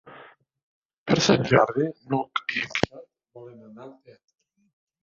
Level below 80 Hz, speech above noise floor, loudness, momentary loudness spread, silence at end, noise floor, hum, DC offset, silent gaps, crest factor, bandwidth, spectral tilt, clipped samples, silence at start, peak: -58 dBFS; 26 dB; -23 LUFS; 26 LU; 1.1 s; -51 dBFS; none; under 0.1%; 0.63-0.89 s, 0.98-1.06 s; 26 dB; 7.6 kHz; -5 dB/octave; under 0.1%; 0.05 s; -2 dBFS